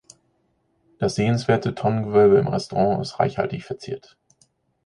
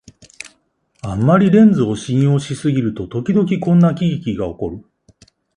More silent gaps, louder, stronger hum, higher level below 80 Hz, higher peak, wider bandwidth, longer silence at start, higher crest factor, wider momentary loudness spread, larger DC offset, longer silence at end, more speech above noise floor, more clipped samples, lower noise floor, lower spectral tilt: neither; second, -21 LUFS vs -16 LUFS; neither; second, -54 dBFS vs -46 dBFS; second, -4 dBFS vs 0 dBFS; about the same, 11 kHz vs 11 kHz; first, 1 s vs 0.45 s; about the same, 18 dB vs 16 dB; second, 16 LU vs 23 LU; neither; about the same, 0.85 s vs 0.75 s; about the same, 47 dB vs 47 dB; neither; first, -68 dBFS vs -61 dBFS; about the same, -7 dB/octave vs -8 dB/octave